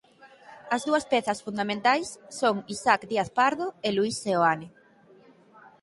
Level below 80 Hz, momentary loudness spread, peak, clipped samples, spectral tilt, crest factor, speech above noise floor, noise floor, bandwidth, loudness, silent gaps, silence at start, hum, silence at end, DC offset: -66 dBFS; 6 LU; -6 dBFS; under 0.1%; -4 dB/octave; 22 dB; 30 dB; -56 dBFS; 11.5 kHz; -26 LUFS; none; 0.25 s; none; 1.15 s; under 0.1%